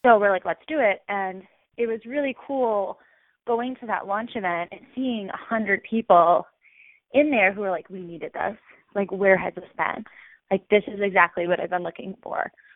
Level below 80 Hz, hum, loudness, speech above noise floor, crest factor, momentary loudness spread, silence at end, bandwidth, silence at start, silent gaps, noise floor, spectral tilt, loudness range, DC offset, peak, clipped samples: -66 dBFS; none; -24 LUFS; 32 dB; 22 dB; 15 LU; 0.25 s; 3.9 kHz; 0.05 s; none; -55 dBFS; -9.5 dB/octave; 5 LU; under 0.1%; -2 dBFS; under 0.1%